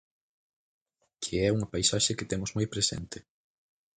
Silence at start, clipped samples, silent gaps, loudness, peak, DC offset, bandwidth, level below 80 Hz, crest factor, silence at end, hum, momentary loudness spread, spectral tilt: 1.2 s; under 0.1%; none; -29 LUFS; -12 dBFS; under 0.1%; 9.6 kHz; -52 dBFS; 22 dB; 0.8 s; none; 14 LU; -3.5 dB/octave